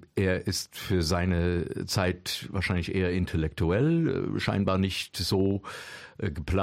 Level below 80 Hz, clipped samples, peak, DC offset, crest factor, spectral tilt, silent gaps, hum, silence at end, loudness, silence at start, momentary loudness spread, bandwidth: -44 dBFS; under 0.1%; -12 dBFS; under 0.1%; 16 dB; -5.5 dB/octave; none; none; 0 s; -28 LUFS; 0.15 s; 8 LU; 16 kHz